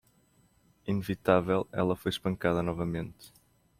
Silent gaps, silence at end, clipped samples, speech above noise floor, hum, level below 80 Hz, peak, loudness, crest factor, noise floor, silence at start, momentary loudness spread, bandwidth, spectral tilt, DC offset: none; 0.5 s; under 0.1%; 36 dB; none; -58 dBFS; -10 dBFS; -30 LUFS; 22 dB; -66 dBFS; 0.85 s; 10 LU; 16 kHz; -7 dB/octave; under 0.1%